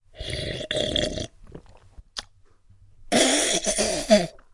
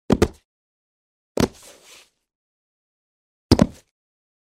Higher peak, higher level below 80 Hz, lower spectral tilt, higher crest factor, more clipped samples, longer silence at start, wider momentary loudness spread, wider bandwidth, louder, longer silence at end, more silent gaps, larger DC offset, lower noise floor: about the same, -4 dBFS vs -2 dBFS; second, -44 dBFS vs -38 dBFS; second, -2.5 dB/octave vs -6 dB/octave; about the same, 22 dB vs 24 dB; neither; about the same, 0.15 s vs 0.1 s; first, 18 LU vs 6 LU; second, 11.5 kHz vs 16 kHz; about the same, -23 LUFS vs -22 LUFS; second, 0.25 s vs 0.85 s; second, none vs 0.45-1.35 s, 2.35-3.50 s; neither; about the same, -54 dBFS vs -51 dBFS